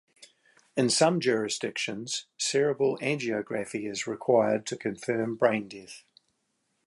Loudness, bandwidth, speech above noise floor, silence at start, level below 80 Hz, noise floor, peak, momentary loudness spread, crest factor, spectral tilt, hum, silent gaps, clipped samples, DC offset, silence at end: -28 LUFS; 11.5 kHz; 48 dB; 0.2 s; -74 dBFS; -76 dBFS; -8 dBFS; 10 LU; 20 dB; -4 dB/octave; none; none; under 0.1%; under 0.1%; 0.9 s